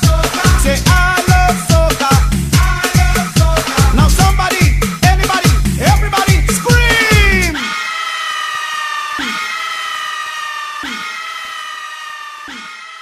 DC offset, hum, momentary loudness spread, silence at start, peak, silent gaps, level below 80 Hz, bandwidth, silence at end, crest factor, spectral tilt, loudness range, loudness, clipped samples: under 0.1%; none; 13 LU; 0 s; 0 dBFS; none; -18 dBFS; 15.5 kHz; 0 s; 12 dB; -4 dB/octave; 9 LU; -13 LUFS; under 0.1%